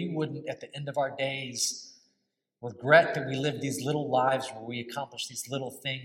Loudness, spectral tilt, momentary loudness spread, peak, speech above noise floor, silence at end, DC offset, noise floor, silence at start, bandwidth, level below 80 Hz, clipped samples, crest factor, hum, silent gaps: -29 LUFS; -4 dB/octave; 16 LU; -6 dBFS; 50 dB; 0 s; under 0.1%; -79 dBFS; 0 s; 16.5 kHz; -78 dBFS; under 0.1%; 24 dB; none; none